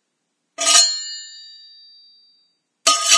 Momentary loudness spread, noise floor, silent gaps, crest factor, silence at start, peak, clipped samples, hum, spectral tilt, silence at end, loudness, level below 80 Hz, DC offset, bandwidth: 23 LU; -74 dBFS; none; 20 dB; 0.6 s; 0 dBFS; under 0.1%; none; 4.5 dB/octave; 0 s; -15 LUFS; -84 dBFS; under 0.1%; 11 kHz